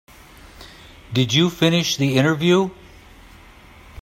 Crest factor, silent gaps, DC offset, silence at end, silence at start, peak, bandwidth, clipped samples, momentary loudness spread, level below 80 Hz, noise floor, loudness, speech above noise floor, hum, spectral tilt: 18 dB; none; under 0.1%; 1.3 s; 0.6 s; -2 dBFS; 16 kHz; under 0.1%; 6 LU; -50 dBFS; -45 dBFS; -18 LUFS; 28 dB; none; -5 dB/octave